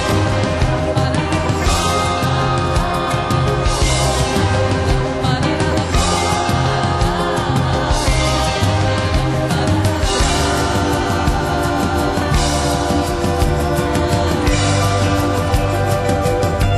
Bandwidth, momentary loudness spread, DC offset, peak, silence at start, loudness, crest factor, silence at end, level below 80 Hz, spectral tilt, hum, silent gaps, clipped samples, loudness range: 12.5 kHz; 2 LU; under 0.1%; -4 dBFS; 0 s; -16 LUFS; 12 dB; 0 s; -24 dBFS; -5 dB/octave; none; none; under 0.1%; 1 LU